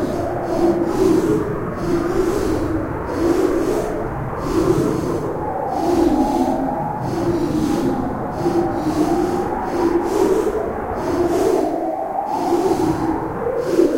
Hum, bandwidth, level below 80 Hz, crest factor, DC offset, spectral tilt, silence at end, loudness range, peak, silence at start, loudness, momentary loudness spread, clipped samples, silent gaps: none; 16 kHz; -36 dBFS; 16 dB; under 0.1%; -7 dB/octave; 0 s; 1 LU; -4 dBFS; 0 s; -20 LUFS; 6 LU; under 0.1%; none